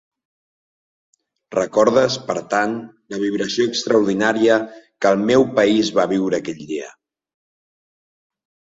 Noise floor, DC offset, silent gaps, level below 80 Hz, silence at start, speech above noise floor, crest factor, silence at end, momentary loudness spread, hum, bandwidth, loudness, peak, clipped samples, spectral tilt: under -90 dBFS; under 0.1%; none; -60 dBFS; 1.5 s; over 72 dB; 18 dB; 1.75 s; 13 LU; none; 7.8 kHz; -18 LUFS; -2 dBFS; under 0.1%; -4.5 dB/octave